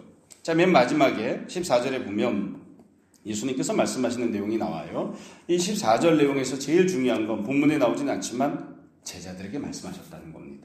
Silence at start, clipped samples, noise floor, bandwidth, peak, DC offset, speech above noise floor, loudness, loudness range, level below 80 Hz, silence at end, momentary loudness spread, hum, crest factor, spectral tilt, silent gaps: 0.45 s; under 0.1%; -56 dBFS; 15.5 kHz; -6 dBFS; under 0.1%; 31 dB; -25 LUFS; 5 LU; -64 dBFS; 0.05 s; 19 LU; none; 20 dB; -5 dB/octave; none